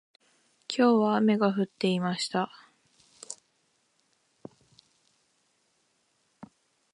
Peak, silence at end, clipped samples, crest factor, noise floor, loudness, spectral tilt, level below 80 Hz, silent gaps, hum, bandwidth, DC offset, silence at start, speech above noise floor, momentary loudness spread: -10 dBFS; 0.5 s; under 0.1%; 20 dB; -72 dBFS; -26 LUFS; -5.5 dB/octave; -80 dBFS; none; none; 11 kHz; under 0.1%; 0.7 s; 47 dB; 22 LU